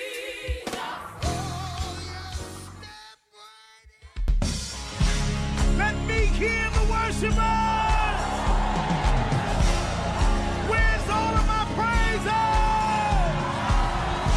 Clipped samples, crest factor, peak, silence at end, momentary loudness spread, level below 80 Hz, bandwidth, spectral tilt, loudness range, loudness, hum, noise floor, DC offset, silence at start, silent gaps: under 0.1%; 14 dB; -10 dBFS; 0 s; 11 LU; -28 dBFS; 12.5 kHz; -5 dB/octave; 10 LU; -25 LUFS; none; -52 dBFS; under 0.1%; 0 s; none